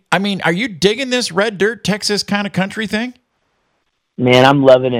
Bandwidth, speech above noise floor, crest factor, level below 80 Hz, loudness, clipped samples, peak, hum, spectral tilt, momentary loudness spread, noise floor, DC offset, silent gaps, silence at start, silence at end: 16 kHz; 53 dB; 16 dB; -52 dBFS; -15 LUFS; 0.2%; 0 dBFS; none; -4.5 dB/octave; 10 LU; -67 dBFS; under 0.1%; none; 0.1 s; 0 s